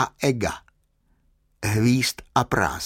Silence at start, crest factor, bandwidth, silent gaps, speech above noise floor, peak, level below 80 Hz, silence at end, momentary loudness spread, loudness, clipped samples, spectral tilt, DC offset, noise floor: 0 s; 20 dB; 17 kHz; none; 43 dB; -4 dBFS; -46 dBFS; 0 s; 9 LU; -23 LUFS; under 0.1%; -5 dB/octave; under 0.1%; -65 dBFS